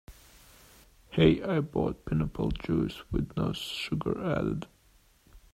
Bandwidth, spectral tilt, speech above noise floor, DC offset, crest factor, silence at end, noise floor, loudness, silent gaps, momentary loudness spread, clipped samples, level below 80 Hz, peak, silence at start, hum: 15 kHz; -7 dB/octave; 34 dB; under 0.1%; 22 dB; 0.15 s; -63 dBFS; -30 LUFS; none; 10 LU; under 0.1%; -46 dBFS; -8 dBFS; 0.1 s; none